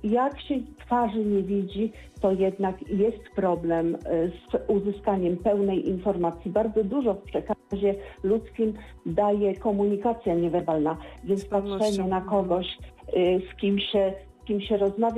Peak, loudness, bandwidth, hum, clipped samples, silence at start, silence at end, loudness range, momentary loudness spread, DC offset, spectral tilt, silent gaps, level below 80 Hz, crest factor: -12 dBFS; -26 LUFS; 11.5 kHz; none; under 0.1%; 0 s; 0 s; 1 LU; 6 LU; under 0.1%; -7.5 dB/octave; none; -48 dBFS; 14 dB